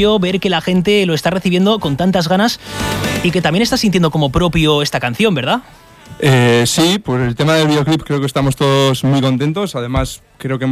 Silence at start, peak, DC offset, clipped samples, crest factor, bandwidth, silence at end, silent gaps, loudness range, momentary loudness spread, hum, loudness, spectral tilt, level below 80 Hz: 0 s; 0 dBFS; under 0.1%; under 0.1%; 12 dB; 15.5 kHz; 0 s; none; 1 LU; 7 LU; none; -14 LUFS; -5.5 dB/octave; -36 dBFS